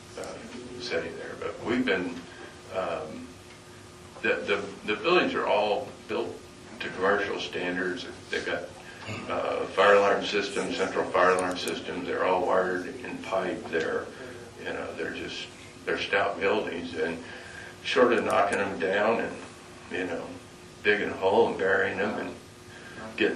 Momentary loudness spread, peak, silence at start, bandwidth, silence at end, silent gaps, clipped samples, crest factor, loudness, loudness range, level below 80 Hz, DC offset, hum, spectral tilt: 18 LU; -8 dBFS; 0 s; 12.5 kHz; 0 s; none; under 0.1%; 20 dB; -28 LUFS; 7 LU; -62 dBFS; under 0.1%; none; -4 dB/octave